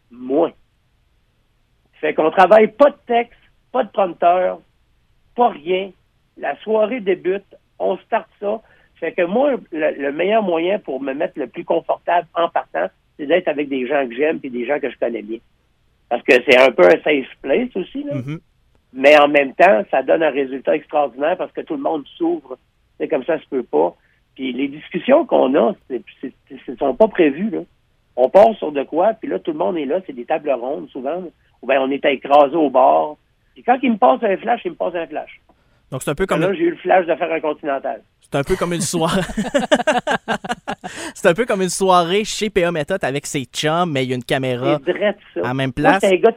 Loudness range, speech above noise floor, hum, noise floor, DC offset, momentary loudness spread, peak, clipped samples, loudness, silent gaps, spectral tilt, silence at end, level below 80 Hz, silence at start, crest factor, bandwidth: 6 LU; 43 dB; none; -61 dBFS; under 0.1%; 14 LU; 0 dBFS; under 0.1%; -18 LUFS; none; -5 dB/octave; 0 s; -50 dBFS; 0.15 s; 18 dB; 16 kHz